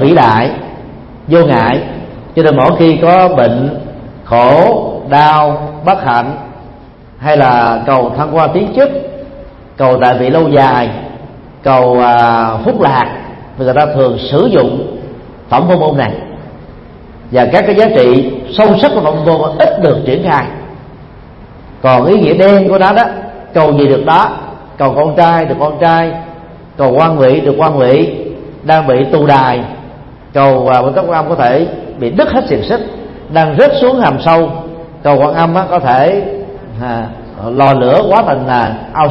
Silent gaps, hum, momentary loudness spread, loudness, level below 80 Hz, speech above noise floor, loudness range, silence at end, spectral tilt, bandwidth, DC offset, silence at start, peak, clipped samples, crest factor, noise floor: none; none; 17 LU; -9 LUFS; -38 dBFS; 26 dB; 3 LU; 0 s; -9 dB/octave; 6 kHz; under 0.1%; 0 s; 0 dBFS; 0.3%; 10 dB; -34 dBFS